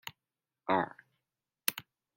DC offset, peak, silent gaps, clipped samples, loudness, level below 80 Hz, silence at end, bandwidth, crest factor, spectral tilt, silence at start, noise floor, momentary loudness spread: under 0.1%; -8 dBFS; none; under 0.1%; -35 LUFS; -80 dBFS; 0.35 s; 16.5 kHz; 32 dB; -3 dB/octave; 0.05 s; under -90 dBFS; 16 LU